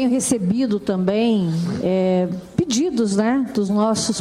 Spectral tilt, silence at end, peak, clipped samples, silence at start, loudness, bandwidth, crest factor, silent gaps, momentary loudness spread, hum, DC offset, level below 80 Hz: -5.5 dB/octave; 0 s; -4 dBFS; under 0.1%; 0 s; -20 LUFS; 15 kHz; 16 dB; none; 3 LU; none; under 0.1%; -54 dBFS